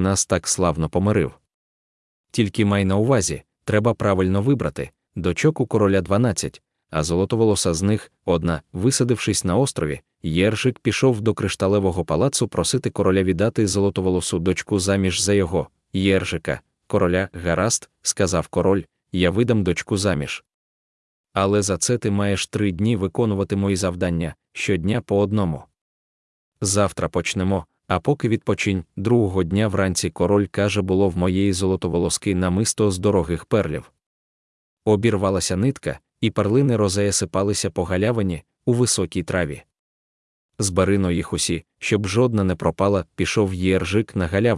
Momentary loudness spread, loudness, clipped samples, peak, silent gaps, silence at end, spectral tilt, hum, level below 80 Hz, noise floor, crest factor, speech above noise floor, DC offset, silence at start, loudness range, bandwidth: 7 LU; -21 LUFS; under 0.1%; -4 dBFS; 1.54-2.24 s, 20.54-21.24 s, 25.81-26.52 s, 34.06-34.77 s, 39.79-40.49 s; 0 s; -5 dB/octave; none; -48 dBFS; under -90 dBFS; 18 dB; over 70 dB; under 0.1%; 0 s; 3 LU; 12 kHz